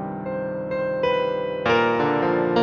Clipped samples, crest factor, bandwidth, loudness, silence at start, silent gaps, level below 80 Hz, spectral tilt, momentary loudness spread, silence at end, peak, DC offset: under 0.1%; 14 dB; 6.8 kHz; -23 LUFS; 0 s; none; -56 dBFS; -7 dB/octave; 9 LU; 0 s; -8 dBFS; under 0.1%